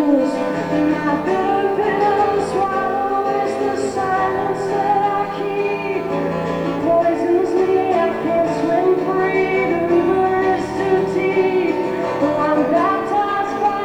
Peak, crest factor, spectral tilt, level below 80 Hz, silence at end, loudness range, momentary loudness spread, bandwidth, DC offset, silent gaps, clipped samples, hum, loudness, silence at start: -4 dBFS; 12 dB; -6.5 dB/octave; -54 dBFS; 0 s; 2 LU; 4 LU; 11 kHz; under 0.1%; none; under 0.1%; none; -18 LUFS; 0 s